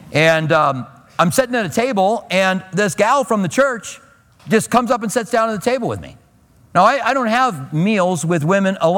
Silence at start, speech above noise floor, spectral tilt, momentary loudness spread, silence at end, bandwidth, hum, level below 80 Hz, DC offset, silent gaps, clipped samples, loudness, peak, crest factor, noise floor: 0 s; 35 dB; -5 dB/octave; 6 LU; 0 s; 18.5 kHz; none; -54 dBFS; under 0.1%; none; under 0.1%; -16 LUFS; 0 dBFS; 16 dB; -51 dBFS